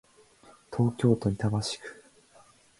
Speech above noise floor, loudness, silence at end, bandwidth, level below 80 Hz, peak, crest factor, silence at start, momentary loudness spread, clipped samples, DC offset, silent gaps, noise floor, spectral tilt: 32 dB; -28 LUFS; 0.85 s; 11.5 kHz; -56 dBFS; -10 dBFS; 22 dB; 0.7 s; 13 LU; under 0.1%; under 0.1%; none; -59 dBFS; -6.5 dB/octave